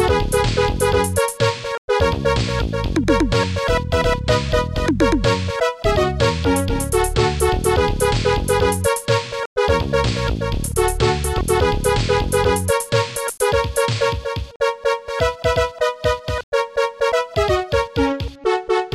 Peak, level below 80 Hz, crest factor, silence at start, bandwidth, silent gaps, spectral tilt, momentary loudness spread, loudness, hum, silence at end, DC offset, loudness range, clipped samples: -2 dBFS; -28 dBFS; 16 dB; 0 s; 15 kHz; 1.78-1.88 s, 9.46-9.56 s, 14.56-14.60 s, 16.43-16.52 s; -5 dB/octave; 4 LU; -19 LUFS; none; 0 s; under 0.1%; 2 LU; under 0.1%